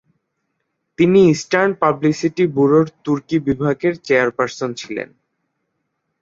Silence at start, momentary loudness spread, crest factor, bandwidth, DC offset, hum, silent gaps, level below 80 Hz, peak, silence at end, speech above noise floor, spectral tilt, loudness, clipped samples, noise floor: 1 s; 12 LU; 16 dB; 7.8 kHz; under 0.1%; none; none; -54 dBFS; -2 dBFS; 1.15 s; 57 dB; -6.5 dB/octave; -17 LUFS; under 0.1%; -73 dBFS